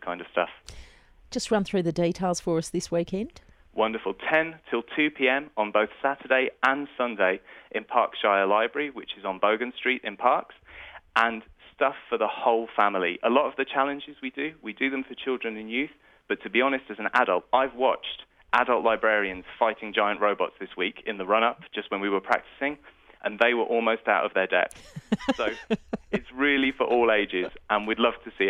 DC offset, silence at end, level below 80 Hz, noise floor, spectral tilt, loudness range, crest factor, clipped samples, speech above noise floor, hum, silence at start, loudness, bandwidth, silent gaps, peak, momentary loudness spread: under 0.1%; 0 s; -58 dBFS; -46 dBFS; -4.5 dB/octave; 3 LU; 20 dB; under 0.1%; 20 dB; none; 0 s; -26 LUFS; 12.5 kHz; none; -6 dBFS; 10 LU